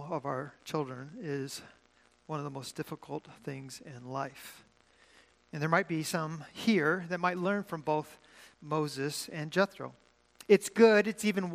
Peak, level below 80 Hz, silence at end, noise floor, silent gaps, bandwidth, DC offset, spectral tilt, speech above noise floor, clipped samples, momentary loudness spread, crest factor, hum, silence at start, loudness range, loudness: -10 dBFS; -76 dBFS; 0 s; -67 dBFS; none; 15.5 kHz; under 0.1%; -5 dB/octave; 35 dB; under 0.1%; 18 LU; 24 dB; none; 0 s; 12 LU; -32 LUFS